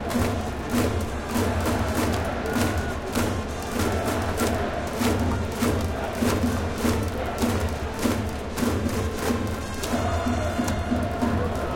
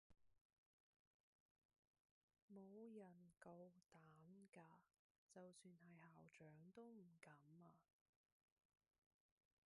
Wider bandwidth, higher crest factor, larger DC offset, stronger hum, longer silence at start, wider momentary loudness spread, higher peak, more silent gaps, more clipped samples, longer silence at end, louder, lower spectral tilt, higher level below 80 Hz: first, 17 kHz vs 11 kHz; about the same, 18 dB vs 22 dB; neither; neither; about the same, 0 s vs 0.1 s; second, 4 LU vs 7 LU; first, -8 dBFS vs -48 dBFS; second, none vs 0.41-0.50 s, 0.58-1.69 s, 1.78-1.94 s, 2.00-2.28 s, 2.42-2.48 s, 4.99-5.27 s; neither; second, 0 s vs 1.85 s; first, -26 LUFS vs -66 LUFS; about the same, -5.5 dB/octave vs -6 dB/octave; first, -36 dBFS vs under -90 dBFS